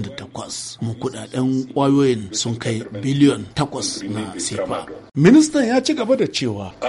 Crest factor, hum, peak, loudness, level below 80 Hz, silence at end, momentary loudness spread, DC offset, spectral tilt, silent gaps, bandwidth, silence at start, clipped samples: 16 dB; none; -2 dBFS; -19 LUFS; -54 dBFS; 0 s; 14 LU; under 0.1%; -5 dB/octave; none; 11.5 kHz; 0 s; under 0.1%